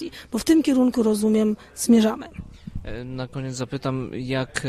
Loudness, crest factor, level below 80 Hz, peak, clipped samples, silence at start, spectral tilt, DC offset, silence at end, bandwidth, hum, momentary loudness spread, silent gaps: -22 LUFS; 16 dB; -44 dBFS; -6 dBFS; under 0.1%; 0 s; -5.5 dB/octave; under 0.1%; 0 s; 15 kHz; none; 17 LU; none